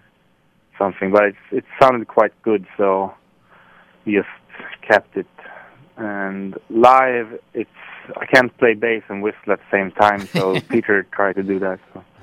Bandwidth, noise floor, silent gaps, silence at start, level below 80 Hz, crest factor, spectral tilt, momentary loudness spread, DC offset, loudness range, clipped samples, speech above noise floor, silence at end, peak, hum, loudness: 15.5 kHz; -59 dBFS; none; 0.8 s; -60 dBFS; 20 dB; -6 dB/octave; 16 LU; under 0.1%; 6 LU; under 0.1%; 41 dB; 0.2 s; 0 dBFS; none; -18 LUFS